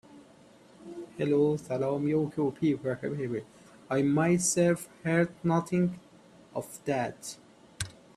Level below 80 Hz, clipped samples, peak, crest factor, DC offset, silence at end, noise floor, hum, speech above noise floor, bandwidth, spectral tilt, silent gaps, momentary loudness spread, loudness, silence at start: -64 dBFS; under 0.1%; -12 dBFS; 18 dB; under 0.1%; 0.25 s; -56 dBFS; none; 28 dB; 14.5 kHz; -5.5 dB/octave; none; 16 LU; -29 LUFS; 0.15 s